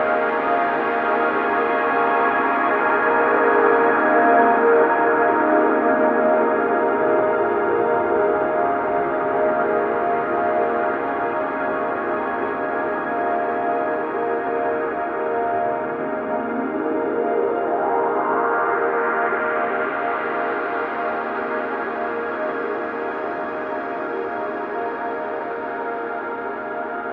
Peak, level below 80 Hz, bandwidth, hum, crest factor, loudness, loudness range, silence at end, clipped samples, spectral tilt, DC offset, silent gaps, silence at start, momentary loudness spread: -4 dBFS; -60 dBFS; 5.2 kHz; none; 16 dB; -20 LUFS; 9 LU; 0 s; under 0.1%; -8 dB/octave; under 0.1%; none; 0 s; 10 LU